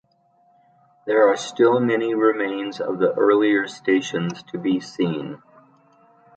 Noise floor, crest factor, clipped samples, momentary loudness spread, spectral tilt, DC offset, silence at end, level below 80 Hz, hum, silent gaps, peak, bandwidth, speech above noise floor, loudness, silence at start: -61 dBFS; 18 dB; under 0.1%; 10 LU; -5.5 dB/octave; under 0.1%; 1 s; -72 dBFS; none; none; -4 dBFS; 9 kHz; 41 dB; -21 LUFS; 1.05 s